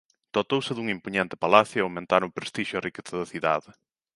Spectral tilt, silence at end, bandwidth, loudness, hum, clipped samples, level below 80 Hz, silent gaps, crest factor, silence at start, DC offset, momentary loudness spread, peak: -5 dB/octave; 0.45 s; 11.5 kHz; -26 LUFS; none; under 0.1%; -64 dBFS; none; 26 dB; 0.35 s; under 0.1%; 12 LU; -2 dBFS